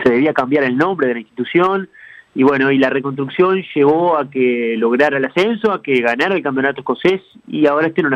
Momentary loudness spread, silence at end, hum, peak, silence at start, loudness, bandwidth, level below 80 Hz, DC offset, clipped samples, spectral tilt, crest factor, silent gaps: 6 LU; 0 s; none; -2 dBFS; 0 s; -16 LUFS; 8.4 kHz; -58 dBFS; under 0.1%; under 0.1%; -7 dB/octave; 14 dB; none